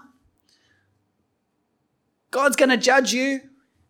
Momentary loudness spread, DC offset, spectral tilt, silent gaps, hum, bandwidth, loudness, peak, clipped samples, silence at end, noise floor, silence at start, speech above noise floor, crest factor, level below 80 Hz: 12 LU; under 0.1%; -2 dB/octave; none; none; 18 kHz; -20 LUFS; -4 dBFS; under 0.1%; 0.5 s; -72 dBFS; 2.35 s; 53 dB; 20 dB; -74 dBFS